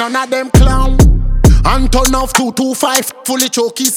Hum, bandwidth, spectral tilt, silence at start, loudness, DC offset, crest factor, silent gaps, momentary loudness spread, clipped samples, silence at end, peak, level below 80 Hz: none; 17.5 kHz; -4.5 dB/octave; 0 s; -12 LUFS; under 0.1%; 10 dB; none; 5 LU; 0.3%; 0 s; 0 dBFS; -14 dBFS